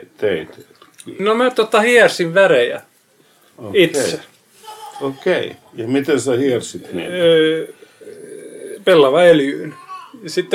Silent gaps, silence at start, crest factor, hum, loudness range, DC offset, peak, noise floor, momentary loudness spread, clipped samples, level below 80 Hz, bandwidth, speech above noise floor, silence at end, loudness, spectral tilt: none; 0.2 s; 16 dB; none; 5 LU; under 0.1%; 0 dBFS; -54 dBFS; 23 LU; under 0.1%; -64 dBFS; 15 kHz; 39 dB; 0 s; -15 LUFS; -4.5 dB/octave